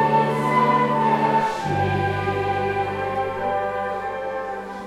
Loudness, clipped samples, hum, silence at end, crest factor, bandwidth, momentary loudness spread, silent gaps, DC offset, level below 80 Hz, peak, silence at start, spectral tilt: -22 LUFS; under 0.1%; none; 0 s; 14 dB; 14 kHz; 9 LU; none; under 0.1%; -50 dBFS; -8 dBFS; 0 s; -6.5 dB/octave